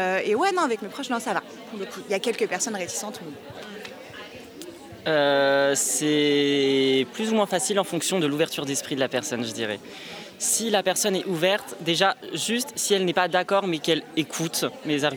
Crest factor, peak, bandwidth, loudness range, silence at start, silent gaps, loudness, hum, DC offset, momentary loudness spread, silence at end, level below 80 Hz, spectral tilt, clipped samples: 20 dB; -6 dBFS; over 20 kHz; 7 LU; 0 s; none; -24 LUFS; none; under 0.1%; 17 LU; 0 s; -72 dBFS; -3 dB/octave; under 0.1%